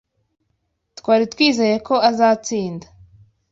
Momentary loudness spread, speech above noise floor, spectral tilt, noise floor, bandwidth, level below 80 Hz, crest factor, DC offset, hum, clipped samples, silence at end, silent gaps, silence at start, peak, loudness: 14 LU; 54 dB; -4 dB/octave; -71 dBFS; 7.8 kHz; -58 dBFS; 16 dB; under 0.1%; none; under 0.1%; 0.7 s; none; 1.05 s; -2 dBFS; -17 LUFS